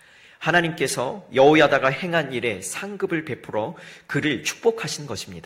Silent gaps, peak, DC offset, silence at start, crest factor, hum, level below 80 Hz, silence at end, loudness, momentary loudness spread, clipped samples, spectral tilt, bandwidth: none; -4 dBFS; under 0.1%; 0.4 s; 20 dB; none; -60 dBFS; 0.05 s; -22 LUFS; 13 LU; under 0.1%; -4 dB/octave; 16 kHz